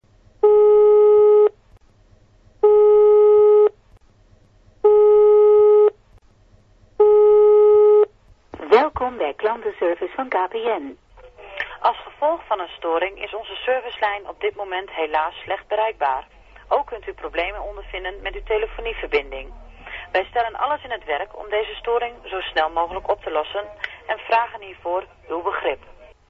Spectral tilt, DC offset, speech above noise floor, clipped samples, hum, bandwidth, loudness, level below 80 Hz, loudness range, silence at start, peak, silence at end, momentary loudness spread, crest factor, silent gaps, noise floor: -6 dB/octave; under 0.1%; 29 dB; under 0.1%; none; 4.6 kHz; -18 LUFS; -46 dBFS; 11 LU; 0.45 s; 0 dBFS; 0.55 s; 17 LU; 18 dB; none; -53 dBFS